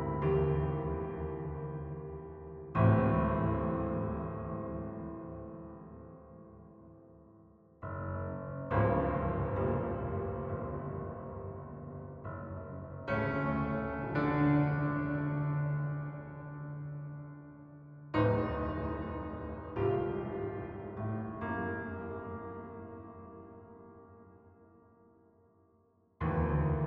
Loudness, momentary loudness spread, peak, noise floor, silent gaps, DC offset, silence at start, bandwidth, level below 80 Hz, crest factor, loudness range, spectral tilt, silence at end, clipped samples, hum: -35 LUFS; 20 LU; -14 dBFS; -69 dBFS; none; under 0.1%; 0 s; 5.2 kHz; -48 dBFS; 22 dB; 13 LU; -8.5 dB/octave; 0 s; under 0.1%; none